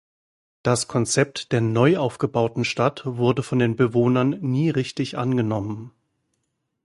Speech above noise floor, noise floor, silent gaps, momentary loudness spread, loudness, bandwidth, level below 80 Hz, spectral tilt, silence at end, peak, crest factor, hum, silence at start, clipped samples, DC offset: 53 dB; -75 dBFS; none; 7 LU; -22 LUFS; 11.5 kHz; -56 dBFS; -6 dB/octave; 1 s; -4 dBFS; 20 dB; none; 0.65 s; under 0.1%; under 0.1%